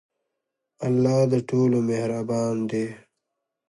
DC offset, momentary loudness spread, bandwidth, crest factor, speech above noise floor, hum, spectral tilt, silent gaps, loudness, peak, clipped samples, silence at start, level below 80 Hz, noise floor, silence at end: under 0.1%; 9 LU; 11.5 kHz; 16 dB; 60 dB; none; -7.5 dB/octave; none; -24 LUFS; -8 dBFS; under 0.1%; 0.8 s; -66 dBFS; -82 dBFS; 0.7 s